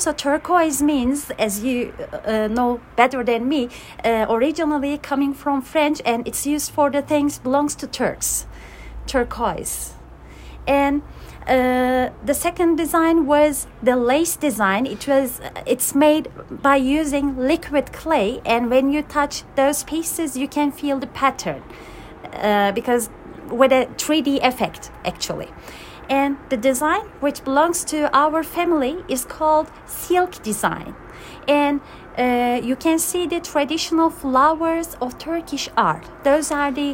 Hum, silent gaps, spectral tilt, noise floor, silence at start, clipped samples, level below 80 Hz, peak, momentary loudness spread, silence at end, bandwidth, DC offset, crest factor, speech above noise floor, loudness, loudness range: none; none; -3.5 dB/octave; -40 dBFS; 0 s; under 0.1%; -44 dBFS; -2 dBFS; 12 LU; 0 s; 16.5 kHz; under 0.1%; 18 dB; 20 dB; -20 LUFS; 4 LU